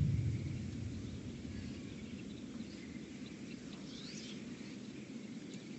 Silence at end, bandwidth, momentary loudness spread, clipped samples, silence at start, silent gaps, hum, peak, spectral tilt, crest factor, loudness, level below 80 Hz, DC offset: 0 s; 8.4 kHz; 8 LU; under 0.1%; 0 s; none; none; -24 dBFS; -6 dB/octave; 20 dB; -45 LUFS; -56 dBFS; under 0.1%